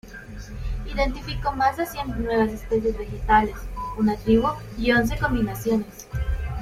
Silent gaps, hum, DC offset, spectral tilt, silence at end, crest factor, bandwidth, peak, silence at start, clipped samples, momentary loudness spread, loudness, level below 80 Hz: none; none; under 0.1%; -6 dB/octave; 0 s; 18 dB; 16 kHz; -6 dBFS; 0.05 s; under 0.1%; 13 LU; -24 LUFS; -32 dBFS